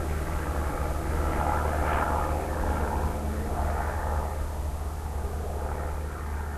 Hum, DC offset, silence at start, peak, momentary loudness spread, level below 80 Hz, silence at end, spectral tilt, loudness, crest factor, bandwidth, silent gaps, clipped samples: none; 0.2%; 0 s; -12 dBFS; 7 LU; -30 dBFS; 0 s; -6.5 dB/octave; -30 LUFS; 16 dB; 13 kHz; none; under 0.1%